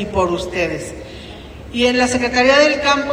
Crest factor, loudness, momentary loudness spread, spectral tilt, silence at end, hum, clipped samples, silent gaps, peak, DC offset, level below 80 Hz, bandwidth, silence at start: 16 dB; -15 LUFS; 22 LU; -3.5 dB/octave; 0 s; none; under 0.1%; none; 0 dBFS; under 0.1%; -38 dBFS; 16 kHz; 0 s